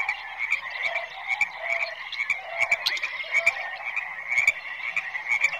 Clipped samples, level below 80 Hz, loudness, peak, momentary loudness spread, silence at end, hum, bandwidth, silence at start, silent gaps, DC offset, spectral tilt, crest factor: under 0.1%; -68 dBFS; -25 LUFS; -8 dBFS; 8 LU; 0 s; none; 15.5 kHz; 0 s; none; under 0.1%; 1 dB/octave; 20 dB